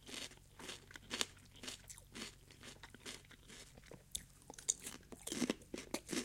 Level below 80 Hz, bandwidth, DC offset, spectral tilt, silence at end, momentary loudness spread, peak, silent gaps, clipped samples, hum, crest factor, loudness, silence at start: -68 dBFS; 16.5 kHz; under 0.1%; -2 dB/octave; 0 s; 15 LU; -14 dBFS; none; under 0.1%; none; 34 dB; -46 LUFS; 0 s